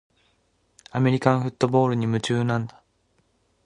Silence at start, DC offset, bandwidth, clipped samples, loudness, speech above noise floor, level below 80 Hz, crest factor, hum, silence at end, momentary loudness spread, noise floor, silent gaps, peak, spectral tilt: 0.95 s; under 0.1%; 10.5 kHz; under 0.1%; -23 LUFS; 45 dB; -60 dBFS; 22 dB; none; 1 s; 8 LU; -67 dBFS; none; -2 dBFS; -7 dB/octave